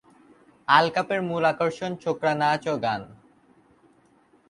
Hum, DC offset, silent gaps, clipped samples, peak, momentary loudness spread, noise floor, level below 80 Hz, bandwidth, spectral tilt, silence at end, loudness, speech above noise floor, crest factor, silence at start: none; under 0.1%; none; under 0.1%; -4 dBFS; 10 LU; -60 dBFS; -66 dBFS; 11.5 kHz; -5.5 dB/octave; 1.35 s; -24 LUFS; 37 dB; 22 dB; 0.7 s